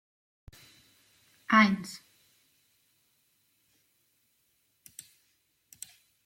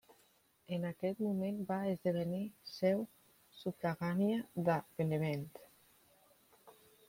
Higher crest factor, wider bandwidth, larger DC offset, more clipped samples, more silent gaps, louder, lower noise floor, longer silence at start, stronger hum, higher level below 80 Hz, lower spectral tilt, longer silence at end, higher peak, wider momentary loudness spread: first, 26 dB vs 18 dB; about the same, 16.5 kHz vs 16.5 kHz; neither; neither; neither; first, -25 LUFS vs -38 LUFS; about the same, -73 dBFS vs -71 dBFS; first, 1.5 s vs 0.7 s; neither; first, -70 dBFS vs -76 dBFS; second, -4.5 dB/octave vs -7.5 dB/octave; first, 4.3 s vs 0.35 s; first, -10 dBFS vs -20 dBFS; first, 27 LU vs 10 LU